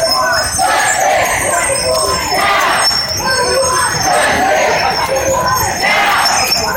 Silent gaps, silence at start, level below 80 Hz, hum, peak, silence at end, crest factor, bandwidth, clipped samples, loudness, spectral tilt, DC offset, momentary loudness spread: none; 0 s; -36 dBFS; none; 0 dBFS; 0 s; 12 dB; 16 kHz; under 0.1%; -11 LUFS; -1.5 dB/octave; under 0.1%; 3 LU